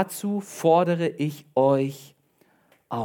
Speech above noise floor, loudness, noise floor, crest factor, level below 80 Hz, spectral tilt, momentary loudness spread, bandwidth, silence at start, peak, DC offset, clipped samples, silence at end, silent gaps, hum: 40 dB; -24 LUFS; -63 dBFS; 18 dB; -76 dBFS; -6.5 dB/octave; 11 LU; 18 kHz; 0 s; -6 dBFS; under 0.1%; under 0.1%; 0 s; none; none